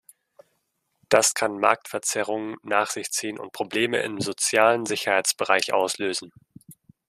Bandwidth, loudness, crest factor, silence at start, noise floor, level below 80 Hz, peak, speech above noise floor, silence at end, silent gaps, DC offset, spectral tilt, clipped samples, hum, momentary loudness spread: 15 kHz; -23 LUFS; 24 dB; 1.1 s; -74 dBFS; -70 dBFS; -2 dBFS; 50 dB; 0.35 s; none; under 0.1%; -2 dB/octave; under 0.1%; none; 9 LU